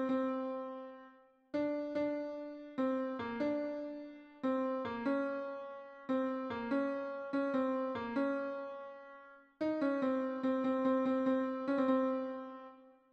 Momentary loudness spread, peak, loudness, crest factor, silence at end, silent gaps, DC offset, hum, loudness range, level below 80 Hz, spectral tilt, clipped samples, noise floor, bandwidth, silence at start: 16 LU; -20 dBFS; -37 LUFS; 16 dB; 0.2 s; none; under 0.1%; none; 4 LU; -76 dBFS; -7 dB/octave; under 0.1%; -62 dBFS; 6.2 kHz; 0 s